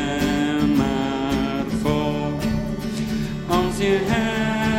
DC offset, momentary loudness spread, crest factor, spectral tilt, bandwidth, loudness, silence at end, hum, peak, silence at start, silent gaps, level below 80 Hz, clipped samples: under 0.1%; 6 LU; 16 dB; -6 dB/octave; 16.5 kHz; -22 LUFS; 0 s; none; -4 dBFS; 0 s; none; -36 dBFS; under 0.1%